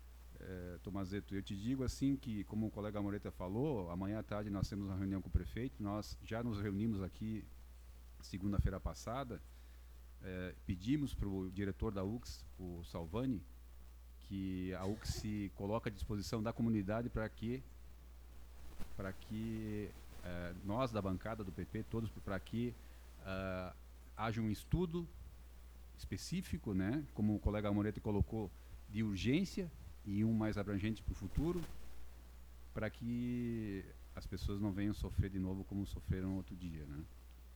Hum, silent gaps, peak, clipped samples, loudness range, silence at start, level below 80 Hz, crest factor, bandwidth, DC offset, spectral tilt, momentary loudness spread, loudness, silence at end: none; none; -22 dBFS; under 0.1%; 5 LU; 0 s; -52 dBFS; 20 dB; over 20 kHz; under 0.1%; -7 dB/octave; 20 LU; -42 LUFS; 0 s